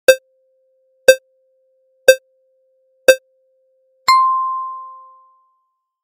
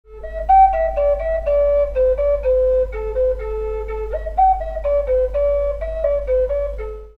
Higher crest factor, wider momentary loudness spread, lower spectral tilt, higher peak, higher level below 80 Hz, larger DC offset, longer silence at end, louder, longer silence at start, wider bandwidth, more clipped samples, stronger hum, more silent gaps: about the same, 18 dB vs 14 dB; first, 13 LU vs 10 LU; second, 0.5 dB/octave vs -8 dB/octave; first, 0 dBFS vs -4 dBFS; second, -68 dBFS vs -28 dBFS; neither; first, 1.15 s vs 0.1 s; first, -15 LUFS vs -18 LUFS; about the same, 0.1 s vs 0.1 s; first, 17 kHz vs 4.9 kHz; first, 0.2% vs under 0.1%; neither; neither